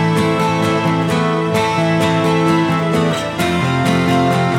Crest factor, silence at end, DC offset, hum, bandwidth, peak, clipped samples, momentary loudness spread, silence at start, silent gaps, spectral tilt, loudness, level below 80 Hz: 12 dB; 0 s; under 0.1%; none; 15.5 kHz; -2 dBFS; under 0.1%; 2 LU; 0 s; none; -6 dB/octave; -15 LUFS; -46 dBFS